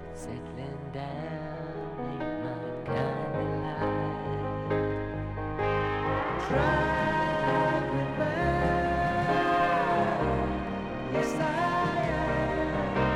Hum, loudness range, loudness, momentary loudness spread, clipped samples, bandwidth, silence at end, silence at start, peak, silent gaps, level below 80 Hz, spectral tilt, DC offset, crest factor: none; 6 LU; -29 LUFS; 11 LU; under 0.1%; 12.5 kHz; 0 s; 0 s; -12 dBFS; none; -44 dBFS; -7 dB/octave; under 0.1%; 16 dB